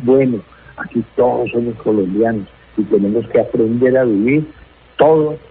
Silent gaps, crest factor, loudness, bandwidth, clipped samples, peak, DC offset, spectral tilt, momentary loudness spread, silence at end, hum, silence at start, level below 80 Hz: none; 14 dB; -15 LUFS; 4.2 kHz; under 0.1%; 0 dBFS; under 0.1%; -13 dB/octave; 12 LU; 0.1 s; none; 0 s; -48 dBFS